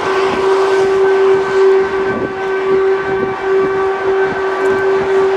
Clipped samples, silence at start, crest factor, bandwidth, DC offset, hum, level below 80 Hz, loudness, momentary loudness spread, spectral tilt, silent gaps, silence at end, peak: under 0.1%; 0 s; 12 dB; 9 kHz; under 0.1%; none; -46 dBFS; -13 LUFS; 6 LU; -5.5 dB/octave; none; 0 s; -2 dBFS